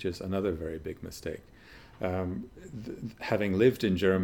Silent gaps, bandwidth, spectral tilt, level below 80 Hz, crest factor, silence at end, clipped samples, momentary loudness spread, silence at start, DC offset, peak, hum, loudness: none; 18.5 kHz; -7 dB/octave; -56 dBFS; 20 dB; 0 s; under 0.1%; 16 LU; 0 s; under 0.1%; -12 dBFS; none; -31 LUFS